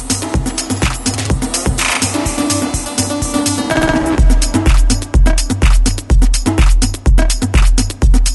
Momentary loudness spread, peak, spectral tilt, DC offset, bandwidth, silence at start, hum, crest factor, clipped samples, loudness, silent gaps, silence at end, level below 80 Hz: 4 LU; 0 dBFS; -4 dB/octave; under 0.1%; 12 kHz; 0 s; none; 12 dB; under 0.1%; -14 LUFS; none; 0 s; -14 dBFS